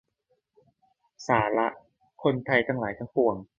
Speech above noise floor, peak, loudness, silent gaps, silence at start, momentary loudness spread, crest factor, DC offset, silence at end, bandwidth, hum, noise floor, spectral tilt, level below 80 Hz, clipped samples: 48 dB; -6 dBFS; -26 LUFS; none; 1.2 s; 7 LU; 22 dB; under 0.1%; 0.15 s; 7.6 kHz; none; -74 dBFS; -6.5 dB/octave; -60 dBFS; under 0.1%